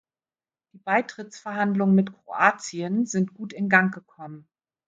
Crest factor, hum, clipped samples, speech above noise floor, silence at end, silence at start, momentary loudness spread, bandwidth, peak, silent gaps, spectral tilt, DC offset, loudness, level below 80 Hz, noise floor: 22 dB; none; under 0.1%; over 66 dB; 0.5 s; 0.85 s; 19 LU; 7.8 kHz; -4 dBFS; none; -6 dB/octave; under 0.1%; -24 LUFS; -74 dBFS; under -90 dBFS